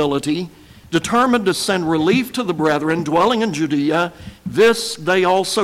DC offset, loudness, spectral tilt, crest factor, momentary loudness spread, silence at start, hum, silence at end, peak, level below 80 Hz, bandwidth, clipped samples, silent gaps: under 0.1%; -17 LUFS; -4.5 dB/octave; 12 dB; 8 LU; 0 s; none; 0 s; -6 dBFS; -50 dBFS; 16.5 kHz; under 0.1%; none